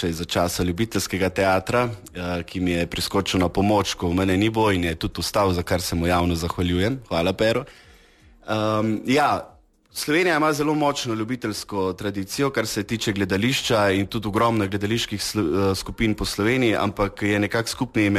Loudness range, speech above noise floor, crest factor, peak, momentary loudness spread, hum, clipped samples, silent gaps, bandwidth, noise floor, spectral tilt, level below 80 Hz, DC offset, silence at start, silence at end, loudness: 2 LU; 30 dB; 14 dB; -8 dBFS; 7 LU; none; under 0.1%; none; 14 kHz; -52 dBFS; -5 dB/octave; -42 dBFS; under 0.1%; 0 s; 0 s; -22 LUFS